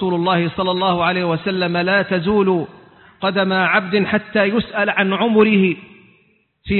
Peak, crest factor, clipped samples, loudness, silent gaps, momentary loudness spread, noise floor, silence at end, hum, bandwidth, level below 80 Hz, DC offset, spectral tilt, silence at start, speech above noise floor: 0 dBFS; 18 dB; under 0.1%; -17 LUFS; none; 6 LU; -59 dBFS; 0 s; none; 4.4 kHz; -48 dBFS; under 0.1%; -11 dB/octave; 0 s; 42 dB